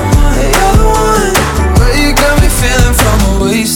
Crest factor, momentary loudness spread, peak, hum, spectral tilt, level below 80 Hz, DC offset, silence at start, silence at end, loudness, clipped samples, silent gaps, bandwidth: 8 dB; 2 LU; 0 dBFS; none; -4.5 dB/octave; -12 dBFS; under 0.1%; 0 s; 0 s; -9 LUFS; 0.3%; none; 19 kHz